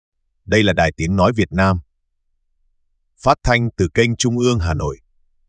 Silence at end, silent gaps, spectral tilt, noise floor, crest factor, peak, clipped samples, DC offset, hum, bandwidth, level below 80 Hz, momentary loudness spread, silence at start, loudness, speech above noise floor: 0.55 s; none; -5.5 dB/octave; -68 dBFS; 18 dB; 0 dBFS; under 0.1%; under 0.1%; none; 10 kHz; -36 dBFS; 7 LU; 0.45 s; -17 LUFS; 51 dB